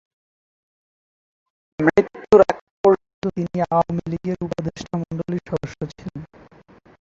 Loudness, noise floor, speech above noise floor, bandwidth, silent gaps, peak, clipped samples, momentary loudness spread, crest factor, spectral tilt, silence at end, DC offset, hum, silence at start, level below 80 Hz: -21 LUFS; -50 dBFS; 27 dB; 7.6 kHz; 2.61-2.84 s, 3.14-3.22 s; -2 dBFS; under 0.1%; 16 LU; 20 dB; -7.5 dB/octave; 0.75 s; under 0.1%; none; 1.8 s; -50 dBFS